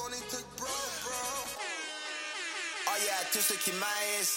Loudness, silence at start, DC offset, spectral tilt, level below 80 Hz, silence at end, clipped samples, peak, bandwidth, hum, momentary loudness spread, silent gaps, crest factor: -33 LUFS; 0 s; under 0.1%; 0 dB/octave; -68 dBFS; 0 s; under 0.1%; -16 dBFS; 17 kHz; none; 9 LU; none; 20 dB